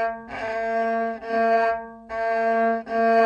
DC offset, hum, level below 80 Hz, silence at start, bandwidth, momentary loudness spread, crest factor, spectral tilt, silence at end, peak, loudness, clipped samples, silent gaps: under 0.1%; none; -58 dBFS; 0 s; 7.2 kHz; 9 LU; 14 dB; -6 dB/octave; 0 s; -10 dBFS; -24 LUFS; under 0.1%; none